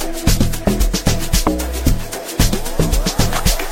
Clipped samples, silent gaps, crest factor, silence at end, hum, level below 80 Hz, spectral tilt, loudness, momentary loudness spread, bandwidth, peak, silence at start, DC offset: under 0.1%; none; 16 dB; 0 s; none; -18 dBFS; -4.5 dB/octave; -18 LUFS; 3 LU; 16.5 kHz; 0 dBFS; 0 s; under 0.1%